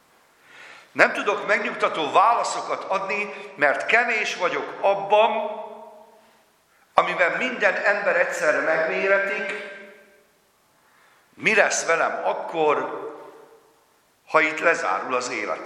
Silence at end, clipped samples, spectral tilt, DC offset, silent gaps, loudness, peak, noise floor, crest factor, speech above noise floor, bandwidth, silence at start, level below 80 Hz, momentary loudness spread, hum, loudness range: 0 s; under 0.1%; -2.5 dB/octave; under 0.1%; none; -22 LUFS; 0 dBFS; -62 dBFS; 24 dB; 40 dB; 13.5 kHz; 0.55 s; -76 dBFS; 12 LU; none; 3 LU